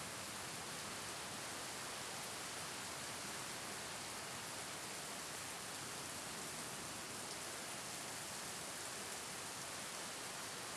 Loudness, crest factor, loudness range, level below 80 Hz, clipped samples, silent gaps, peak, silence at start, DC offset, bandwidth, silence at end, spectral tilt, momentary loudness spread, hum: -45 LUFS; 16 dB; 0 LU; -76 dBFS; under 0.1%; none; -32 dBFS; 0 s; under 0.1%; 12 kHz; 0 s; -1.5 dB/octave; 1 LU; none